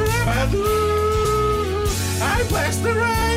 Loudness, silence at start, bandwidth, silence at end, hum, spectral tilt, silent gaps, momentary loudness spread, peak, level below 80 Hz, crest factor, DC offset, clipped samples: -20 LUFS; 0 s; 16 kHz; 0 s; none; -4.5 dB/octave; none; 2 LU; -8 dBFS; -28 dBFS; 10 dB; under 0.1%; under 0.1%